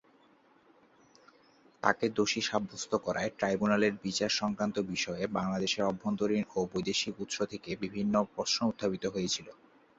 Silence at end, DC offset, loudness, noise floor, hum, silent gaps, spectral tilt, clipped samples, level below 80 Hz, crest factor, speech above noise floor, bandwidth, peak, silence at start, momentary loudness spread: 0.45 s; under 0.1%; -32 LUFS; -64 dBFS; none; none; -4 dB/octave; under 0.1%; -66 dBFS; 24 dB; 32 dB; 8 kHz; -10 dBFS; 1.85 s; 6 LU